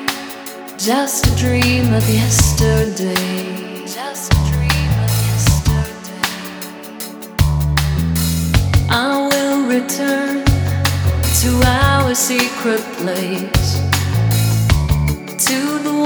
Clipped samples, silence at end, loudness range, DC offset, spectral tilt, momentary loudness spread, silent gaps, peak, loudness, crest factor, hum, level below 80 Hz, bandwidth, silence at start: under 0.1%; 0 s; 3 LU; under 0.1%; -4.5 dB/octave; 12 LU; none; 0 dBFS; -16 LUFS; 14 dB; none; -24 dBFS; over 20 kHz; 0 s